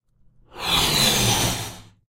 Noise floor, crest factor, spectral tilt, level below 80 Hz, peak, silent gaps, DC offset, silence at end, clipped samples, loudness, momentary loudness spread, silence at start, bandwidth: -56 dBFS; 18 dB; -2 dB/octave; -40 dBFS; -6 dBFS; none; under 0.1%; 0.3 s; under 0.1%; -19 LUFS; 13 LU; 0.55 s; 16 kHz